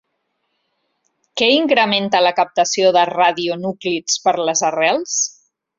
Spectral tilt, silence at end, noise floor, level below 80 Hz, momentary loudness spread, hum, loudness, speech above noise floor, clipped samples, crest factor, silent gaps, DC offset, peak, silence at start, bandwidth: -2 dB/octave; 0.5 s; -71 dBFS; -66 dBFS; 8 LU; none; -16 LUFS; 55 dB; under 0.1%; 16 dB; none; under 0.1%; 0 dBFS; 1.35 s; 7.8 kHz